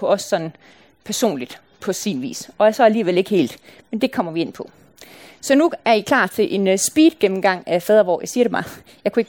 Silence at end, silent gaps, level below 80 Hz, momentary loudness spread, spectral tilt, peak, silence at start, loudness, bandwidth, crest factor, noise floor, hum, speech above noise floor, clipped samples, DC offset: 0.05 s; none; -62 dBFS; 15 LU; -4 dB/octave; -2 dBFS; 0 s; -18 LUFS; 17.5 kHz; 16 dB; -44 dBFS; none; 26 dB; under 0.1%; under 0.1%